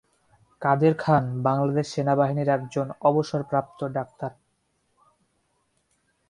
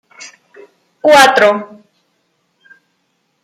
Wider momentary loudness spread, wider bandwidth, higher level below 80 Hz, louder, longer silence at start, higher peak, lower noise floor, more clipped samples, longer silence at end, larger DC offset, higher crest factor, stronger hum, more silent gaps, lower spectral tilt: second, 10 LU vs 16 LU; second, 10.5 kHz vs 16 kHz; about the same, -62 dBFS vs -58 dBFS; second, -24 LUFS vs -9 LUFS; first, 0.6 s vs 0.2 s; second, -6 dBFS vs 0 dBFS; first, -71 dBFS vs -64 dBFS; neither; first, 2 s vs 1.8 s; neither; about the same, 20 dB vs 16 dB; neither; neither; first, -7.5 dB/octave vs -2 dB/octave